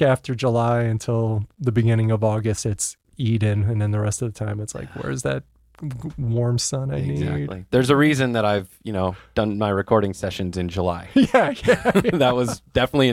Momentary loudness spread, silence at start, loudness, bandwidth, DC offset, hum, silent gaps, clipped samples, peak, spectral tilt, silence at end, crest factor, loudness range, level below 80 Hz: 10 LU; 0 s; -22 LUFS; 14.5 kHz; under 0.1%; none; none; under 0.1%; -2 dBFS; -6 dB/octave; 0 s; 18 dB; 5 LU; -46 dBFS